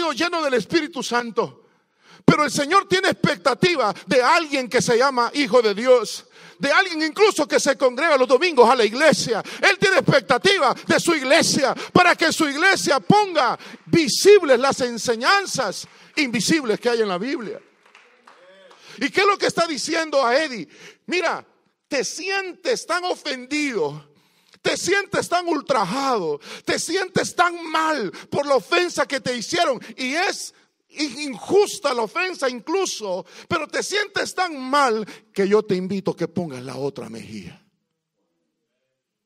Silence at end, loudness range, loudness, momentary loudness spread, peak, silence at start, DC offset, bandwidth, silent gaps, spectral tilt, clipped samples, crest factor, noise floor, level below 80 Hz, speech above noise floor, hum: 1.75 s; 7 LU; -20 LUFS; 11 LU; 0 dBFS; 0 s; under 0.1%; 16 kHz; none; -3.5 dB/octave; under 0.1%; 20 dB; -77 dBFS; -62 dBFS; 57 dB; none